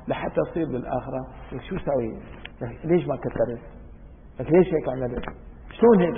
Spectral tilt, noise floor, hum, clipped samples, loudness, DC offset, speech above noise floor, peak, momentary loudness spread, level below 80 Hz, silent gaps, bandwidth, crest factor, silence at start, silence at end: -12 dB/octave; -44 dBFS; none; under 0.1%; -25 LUFS; under 0.1%; 21 dB; -4 dBFS; 19 LU; -44 dBFS; none; 3.7 kHz; 20 dB; 0 s; 0 s